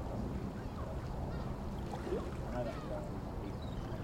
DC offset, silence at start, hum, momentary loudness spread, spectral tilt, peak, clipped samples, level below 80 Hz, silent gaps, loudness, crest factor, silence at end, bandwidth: under 0.1%; 0 s; none; 3 LU; -7.5 dB/octave; -26 dBFS; under 0.1%; -46 dBFS; none; -42 LUFS; 14 dB; 0 s; 16.5 kHz